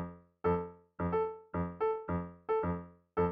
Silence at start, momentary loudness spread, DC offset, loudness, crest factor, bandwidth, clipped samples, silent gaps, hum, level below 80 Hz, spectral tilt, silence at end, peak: 0 s; 7 LU; under 0.1%; -36 LUFS; 14 dB; 4.6 kHz; under 0.1%; none; none; -56 dBFS; -8.5 dB/octave; 0 s; -20 dBFS